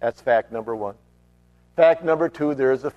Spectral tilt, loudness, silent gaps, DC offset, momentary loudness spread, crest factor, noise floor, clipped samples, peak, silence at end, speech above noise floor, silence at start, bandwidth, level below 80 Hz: -7 dB/octave; -21 LUFS; none; under 0.1%; 13 LU; 20 dB; -57 dBFS; under 0.1%; -2 dBFS; 0.05 s; 36 dB; 0 s; 7.8 kHz; -60 dBFS